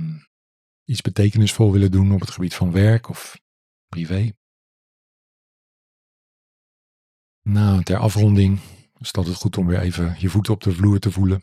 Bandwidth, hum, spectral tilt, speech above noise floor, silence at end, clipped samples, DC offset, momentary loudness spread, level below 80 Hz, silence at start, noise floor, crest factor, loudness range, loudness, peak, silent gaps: 14 kHz; none; -7 dB/octave; over 72 dB; 0 s; under 0.1%; under 0.1%; 15 LU; -50 dBFS; 0 s; under -90 dBFS; 16 dB; 13 LU; -19 LUFS; -4 dBFS; 0.27-0.86 s, 3.41-3.88 s, 4.37-7.42 s